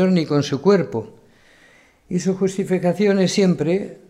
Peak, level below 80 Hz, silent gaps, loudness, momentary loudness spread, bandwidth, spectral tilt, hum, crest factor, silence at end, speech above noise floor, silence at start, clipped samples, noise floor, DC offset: -4 dBFS; -60 dBFS; none; -19 LUFS; 10 LU; 11.5 kHz; -6.5 dB/octave; none; 16 dB; 0.15 s; 34 dB; 0 s; under 0.1%; -52 dBFS; under 0.1%